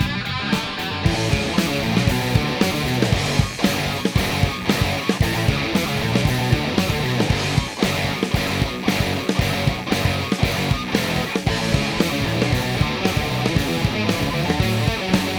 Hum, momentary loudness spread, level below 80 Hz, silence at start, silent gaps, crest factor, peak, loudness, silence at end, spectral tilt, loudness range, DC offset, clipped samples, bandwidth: none; 2 LU; -34 dBFS; 0 s; none; 18 dB; -2 dBFS; -20 LUFS; 0 s; -5 dB/octave; 1 LU; 0.1%; under 0.1%; over 20 kHz